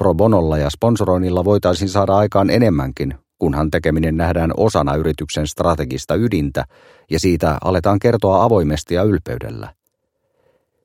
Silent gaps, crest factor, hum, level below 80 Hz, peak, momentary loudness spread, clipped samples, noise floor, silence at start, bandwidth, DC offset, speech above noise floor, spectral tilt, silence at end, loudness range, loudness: none; 16 dB; none; -32 dBFS; 0 dBFS; 9 LU; under 0.1%; -70 dBFS; 0 s; 16.5 kHz; under 0.1%; 54 dB; -7 dB/octave; 1.15 s; 2 LU; -17 LUFS